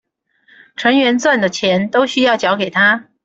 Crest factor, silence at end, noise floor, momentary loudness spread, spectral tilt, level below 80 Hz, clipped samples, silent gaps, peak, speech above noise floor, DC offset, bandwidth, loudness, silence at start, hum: 14 dB; 0.25 s; -55 dBFS; 3 LU; -4 dB/octave; -58 dBFS; under 0.1%; none; -2 dBFS; 41 dB; under 0.1%; 8 kHz; -14 LUFS; 0.8 s; none